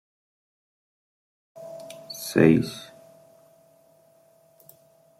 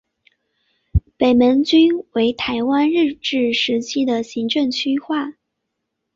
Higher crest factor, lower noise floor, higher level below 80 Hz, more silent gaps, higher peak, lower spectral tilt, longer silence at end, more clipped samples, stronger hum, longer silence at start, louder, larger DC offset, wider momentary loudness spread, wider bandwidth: first, 26 dB vs 16 dB; second, -59 dBFS vs -77 dBFS; second, -64 dBFS vs -36 dBFS; neither; about the same, -4 dBFS vs -4 dBFS; about the same, -6 dB/octave vs -5.5 dB/octave; first, 2.35 s vs 0.85 s; neither; neither; first, 1.55 s vs 0.95 s; second, -22 LUFS vs -18 LUFS; neither; first, 25 LU vs 10 LU; first, 16.5 kHz vs 7.6 kHz